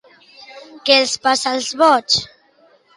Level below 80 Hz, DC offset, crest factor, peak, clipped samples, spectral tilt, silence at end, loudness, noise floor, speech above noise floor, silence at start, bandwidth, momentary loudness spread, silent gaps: -60 dBFS; under 0.1%; 18 dB; -2 dBFS; under 0.1%; -1.5 dB/octave; 0.7 s; -15 LUFS; -54 dBFS; 38 dB; 0.5 s; 11.5 kHz; 9 LU; none